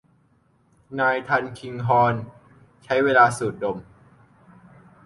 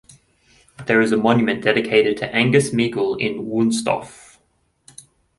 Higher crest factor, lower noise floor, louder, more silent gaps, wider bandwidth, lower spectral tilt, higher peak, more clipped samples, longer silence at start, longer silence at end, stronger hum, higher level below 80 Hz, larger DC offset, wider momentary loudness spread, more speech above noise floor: about the same, 20 dB vs 18 dB; about the same, -62 dBFS vs -64 dBFS; second, -21 LUFS vs -18 LUFS; neither; about the same, 11.5 kHz vs 11.5 kHz; about the same, -5.5 dB/octave vs -5 dB/octave; about the same, -4 dBFS vs -2 dBFS; neither; about the same, 0.9 s vs 0.8 s; about the same, 1.25 s vs 1.25 s; neither; about the same, -60 dBFS vs -56 dBFS; neither; first, 17 LU vs 7 LU; second, 41 dB vs 46 dB